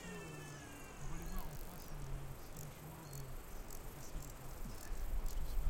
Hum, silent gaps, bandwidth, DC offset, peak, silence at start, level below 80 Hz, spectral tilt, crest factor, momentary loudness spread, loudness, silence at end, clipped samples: none; none; 17 kHz; under 0.1%; -24 dBFS; 0 s; -46 dBFS; -4.5 dB/octave; 20 dB; 5 LU; -50 LUFS; 0 s; under 0.1%